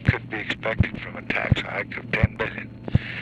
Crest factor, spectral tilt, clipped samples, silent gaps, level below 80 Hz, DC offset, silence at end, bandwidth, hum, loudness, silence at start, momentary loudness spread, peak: 18 dB; -7.5 dB/octave; under 0.1%; none; -38 dBFS; under 0.1%; 0 s; 8 kHz; none; -26 LUFS; 0 s; 6 LU; -6 dBFS